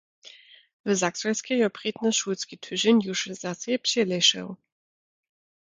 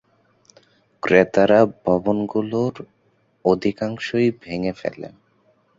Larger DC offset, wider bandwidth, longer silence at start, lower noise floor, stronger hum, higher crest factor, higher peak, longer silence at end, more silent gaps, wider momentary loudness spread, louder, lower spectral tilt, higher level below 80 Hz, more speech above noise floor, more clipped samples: neither; first, 9.6 kHz vs 7.8 kHz; second, 0.25 s vs 1.05 s; second, -51 dBFS vs -63 dBFS; neither; about the same, 20 dB vs 20 dB; second, -8 dBFS vs -2 dBFS; first, 1.2 s vs 0.7 s; first, 0.73-0.84 s vs none; about the same, 12 LU vs 14 LU; second, -25 LUFS vs -20 LUFS; second, -3 dB/octave vs -7 dB/octave; second, -74 dBFS vs -54 dBFS; second, 25 dB vs 43 dB; neither